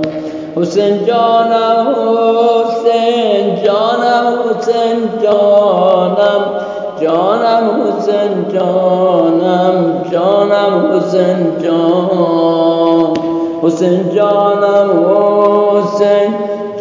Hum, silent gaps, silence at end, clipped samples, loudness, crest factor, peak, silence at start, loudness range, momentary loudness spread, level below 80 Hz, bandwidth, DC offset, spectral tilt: none; none; 0 s; under 0.1%; -11 LUFS; 10 dB; 0 dBFS; 0 s; 1 LU; 5 LU; -58 dBFS; 7.6 kHz; under 0.1%; -7 dB/octave